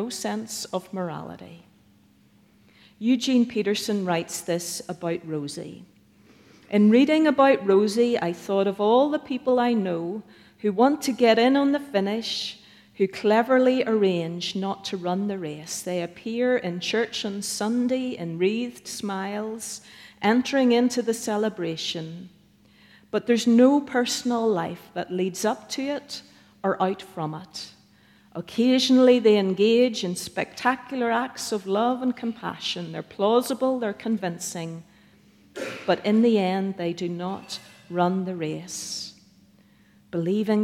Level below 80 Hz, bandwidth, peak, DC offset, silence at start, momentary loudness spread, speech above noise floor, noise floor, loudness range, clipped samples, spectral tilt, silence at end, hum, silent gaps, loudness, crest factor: -70 dBFS; 15.5 kHz; -6 dBFS; under 0.1%; 0 s; 15 LU; 35 dB; -58 dBFS; 7 LU; under 0.1%; -5 dB/octave; 0 s; none; none; -24 LUFS; 18 dB